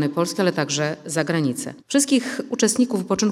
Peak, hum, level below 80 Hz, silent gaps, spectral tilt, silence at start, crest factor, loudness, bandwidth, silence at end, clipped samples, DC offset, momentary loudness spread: -4 dBFS; none; -64 dBFS; none; -4 dB/octave; 0 s; 16 dB; -22 LUFS; over 20 kHz; 0 s; under 0.1%; under 0.1%; 6 LU